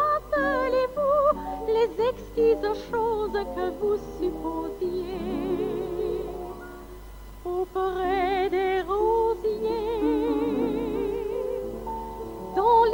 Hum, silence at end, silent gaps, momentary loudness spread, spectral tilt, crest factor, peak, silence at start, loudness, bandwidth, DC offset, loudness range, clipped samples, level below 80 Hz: 50 Hz at -45 dBFS; 0 s; none; 12 LU; -6.5 dB/octave; 16 dB; -10 dBFS; 0 s; -26 LUFS; 19.5 kHz; under 0.1%; 6 LU; under 0.1%; -44 dBFS